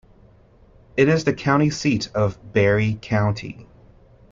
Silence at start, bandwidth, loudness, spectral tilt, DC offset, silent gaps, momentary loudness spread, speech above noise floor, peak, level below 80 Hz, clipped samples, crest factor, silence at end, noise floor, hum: 0.95 s; 7.6 kHz; -21 LUFS; -6.5 dB/octave; under 0.1%; none; 11 LU; 32 dB; -4 dBFS; -48 dBFS; under 0.1%; 18 dB; 0.7 s; -52 dBFS; none